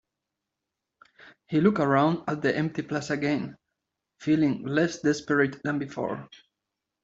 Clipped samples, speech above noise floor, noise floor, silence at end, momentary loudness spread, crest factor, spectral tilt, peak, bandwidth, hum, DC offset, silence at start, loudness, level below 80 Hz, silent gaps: under 0.1%; 60 dB; -85 dBFS; 0.8 s; 10 LU; 20 dB; -6.5 dB/octave; -8 dBFS; 7.8 kHz; none; under 0.1%; 1.5 s; -26 LUFS; -66 dBFS; none